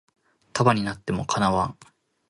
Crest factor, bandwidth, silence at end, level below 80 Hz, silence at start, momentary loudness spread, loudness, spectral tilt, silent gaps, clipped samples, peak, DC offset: 20 dB; 11.5 kHz; 0.6 s; -50 dBFS; 0.55 s; 9 LU; -24 LUFS; -5.5 dB/octave; none; under 0.1%; -4 dBFS; under 0.1%